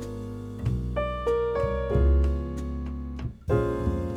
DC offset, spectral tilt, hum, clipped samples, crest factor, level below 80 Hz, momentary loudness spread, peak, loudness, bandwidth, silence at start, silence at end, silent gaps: under 0.1%; -8.5 dB/octave; none; under 0.1%; 14 dB; -30 dBFS; 12 LU; -12 dBFS; -28 LUFS; 8.2 kHz; 0 s; 0 s; none